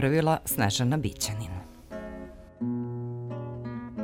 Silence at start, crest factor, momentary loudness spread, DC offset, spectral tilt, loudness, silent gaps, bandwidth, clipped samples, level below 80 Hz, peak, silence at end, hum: 0 s; 20 dB; 17 LU; under 0.1%; -5 dB/octave; -30 LUFS; none; 16.5 kHz; under 0.1%; -50 dBFS; -10 dBFS; 0 s; none